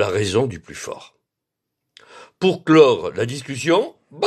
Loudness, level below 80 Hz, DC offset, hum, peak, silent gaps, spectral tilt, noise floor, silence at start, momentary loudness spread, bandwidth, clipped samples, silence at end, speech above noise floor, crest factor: -18 LUFS; -58 dBFS; under 0.1%; none; 0 dBFS; none; -5.5 dB/octave; -81 dBFS; 0 s; 19 LU; 12.5 kHz; under 0.1%; 0 s; 63 dB; 20 dB